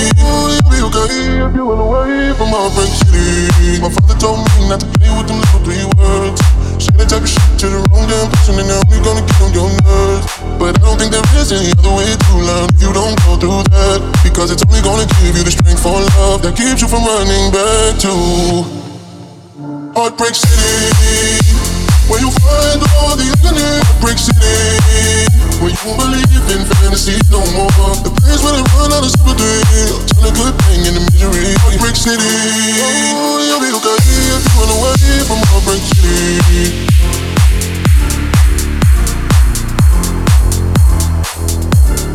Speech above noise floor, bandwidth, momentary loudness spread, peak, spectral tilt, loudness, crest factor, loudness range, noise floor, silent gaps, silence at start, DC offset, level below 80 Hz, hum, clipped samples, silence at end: 23 dB; 16 kHz; 4 LU; 0 dBFS; -4.5 dB/octave; -11 LUFS; 10 dB; 2 LU; -32 dBFS; none; 0 s; under 0.1%; -12 dBFS; none; under 0.1%; 0 s